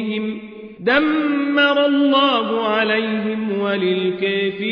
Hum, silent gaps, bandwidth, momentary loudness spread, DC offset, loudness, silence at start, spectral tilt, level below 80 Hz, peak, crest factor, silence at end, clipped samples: none; none; 5.4 kHz; 9 LU; under 0.1%; -18 LUFS; 0 s; -7 dB/octave; -58 dBFS; -4 dBFS; 14 dB; 0 s; under 0.1%